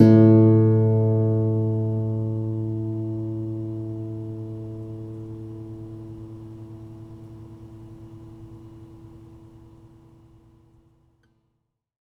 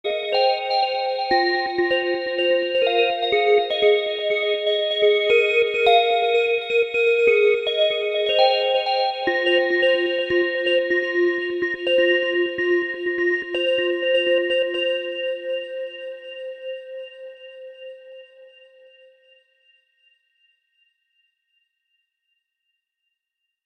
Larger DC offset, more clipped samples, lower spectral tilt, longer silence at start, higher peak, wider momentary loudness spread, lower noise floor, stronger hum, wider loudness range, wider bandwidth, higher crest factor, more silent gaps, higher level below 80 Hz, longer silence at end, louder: neither; neither; first, -11.5 dB/octave vs -3.5 dB/octave; about the same, 0 s vs 0.05 s; first, 0 dBFS vs -4 dBFS; first, 26 LU vs 16 LU; second, -76 dBFS vs -81 dBFS; neither; first, 24 LU vs 13 LU; second, 4.4 kHz vs 8.8 kHz; about the same, 22 dB vs 18 dB; neither; first, -54 dBFS vs -64 dBFS; second, 2.8 s vs 5.2 s; about the same, -22 LUFS vs -20 LUFS